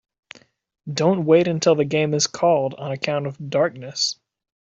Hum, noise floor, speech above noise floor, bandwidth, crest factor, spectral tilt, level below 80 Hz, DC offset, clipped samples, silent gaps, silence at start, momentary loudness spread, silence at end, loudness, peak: none; -48 dBFS; 28 dB; 8 kHz; 18 dB; -4.5 dB/octave; -64 dBFS; under 0.1%; under 0.1%; none; 0.85 s; 10 LU; 0.5 s; -21 LUFS; -4 dBFS